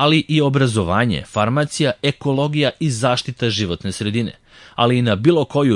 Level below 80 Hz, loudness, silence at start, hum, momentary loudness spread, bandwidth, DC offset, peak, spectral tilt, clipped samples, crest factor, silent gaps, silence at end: -50 dBFS; -18 LUFS; 0 s; none; 6 LU; 11.5 kHz; under 0.1%; -2 dBFS; -5.5 dB/octave; under 0.1%; 16 dB; none; 0 s